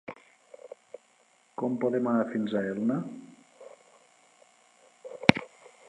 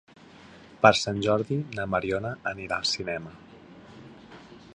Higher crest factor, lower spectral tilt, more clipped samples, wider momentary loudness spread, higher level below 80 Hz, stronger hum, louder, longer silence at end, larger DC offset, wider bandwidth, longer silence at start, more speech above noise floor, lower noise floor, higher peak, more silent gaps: first, 32 dB vs 26 dB; first, -6.5 dB/octave vs -4.5 dB/octave; neither; about the same, 28 LU vs 27 LU; second, -64 dBFS vs -56 dBFS; neither; about the same, -28 LUFS vs -26 LUFS; first, 0.2 s vs 0 s; neither; about the same, 11 kHz vs 10.5 kHz; second, 0.1 s vs 0.45 s; first, 36 dB vs 24 dB; first, -65 dBFS vs -50 dBFS; first, 0 dBFS vs -4 dBFS; neither